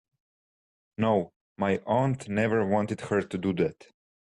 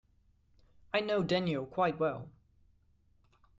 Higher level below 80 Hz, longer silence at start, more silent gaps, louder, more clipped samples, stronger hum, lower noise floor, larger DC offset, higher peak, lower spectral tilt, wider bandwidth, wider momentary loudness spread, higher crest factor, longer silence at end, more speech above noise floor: about the same, -64 dBFS vs -66 dBFS; about the same, 1 s vs 0.95 s; first, 1.36-1.55 s vs none; first, -28 LUFS vs -33 LUFS; neither; second, none vs 50 Hz at -65 dBFS; first, under -90 dBFS vs -69 dBFS; neither; first, -12 dBFS vs -18 dBFS; about the same, -7.5 dB/octave vs -7 dB/octave; first, 11 kHz vs 7.8 kHz; about the same, 5 LU vs 4 LU; about the same, 16 dB vs 18 dB; second, 0.5 s vs 1.3 s; first, over 63 dB vs 36 dB